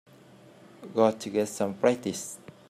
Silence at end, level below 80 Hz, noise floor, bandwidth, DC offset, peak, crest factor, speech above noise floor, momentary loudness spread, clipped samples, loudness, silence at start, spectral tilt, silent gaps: 0.3 s; -74 dBFS; -53 dBFS; 15 kHz; under 0.1%; -8 dBFS; 20 dB; 26 dB; 12 LU; under 0.1%; -28 LUFS; 0.8 s; -5 dB/octave; none